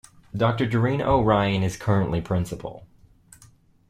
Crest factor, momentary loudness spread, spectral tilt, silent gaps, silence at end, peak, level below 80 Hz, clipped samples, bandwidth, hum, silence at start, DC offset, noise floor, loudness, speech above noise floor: 18 dB; 14 LU; -7 dB/octave; none; 1.05 s; -6 dBFS; -44 dBFS; under 0.1%; 14 kHz; none; 0.35 s; under 0.1%; -55 dBFS; -23 LUFS; 32 dB